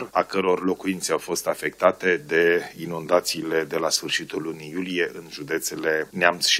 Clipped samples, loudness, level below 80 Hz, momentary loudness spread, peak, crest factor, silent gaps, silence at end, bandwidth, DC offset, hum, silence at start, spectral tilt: under 0.1%; -24 LUFS; -64 dBFS; 11 LU; 0 dBFS; 24 dB; none; 0 s; 16 kHz; under 0.1%; none; 0 s; -2.5 dB/octave